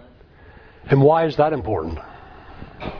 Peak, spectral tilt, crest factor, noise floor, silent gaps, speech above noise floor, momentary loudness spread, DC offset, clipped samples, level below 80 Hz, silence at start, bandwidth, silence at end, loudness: -2 dBFS; -9.5 dB/octave; 20 dB; -47 dBFS; none; 29 dB; 26 LU; under 0.1%; under 0.1%; -42 dBFS; 0.85 s; 5.4 kHz; 0 s; -19 LUFS